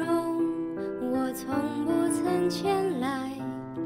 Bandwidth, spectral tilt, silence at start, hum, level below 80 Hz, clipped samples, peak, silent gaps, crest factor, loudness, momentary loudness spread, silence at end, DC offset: 16 kHz; -5.5 dB/octave; 0 s; none; -64 dBFS; under 0.1%; -14 dBFS; none; 14 dB; -29 LUFS; 7 LU; 0 s; under 0.1%